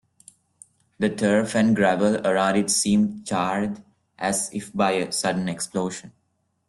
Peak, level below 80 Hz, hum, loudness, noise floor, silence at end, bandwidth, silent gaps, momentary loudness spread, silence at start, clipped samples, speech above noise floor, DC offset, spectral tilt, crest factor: -6 dBFS; -62 dBFS; none; -23 LUFS; -71 dBFS; 0.6 s; 12.5 kHz; none; 9 LU; 1 s; under 0.1%; 49 dB; under 0.1%; -4.5 dB/octave; 18 dB